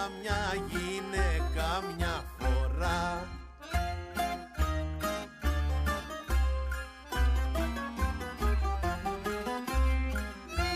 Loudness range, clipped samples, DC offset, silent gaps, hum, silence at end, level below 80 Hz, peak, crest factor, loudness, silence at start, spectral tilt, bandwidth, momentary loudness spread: 1 LU; under 0.1%; under 0.1%; none; none; 0 s; -34 dBFS; -18 dBFS; 14 dB; -33 LUFS; 0 s; -5.5 dB/octave; 15.5 kHz; 5 LU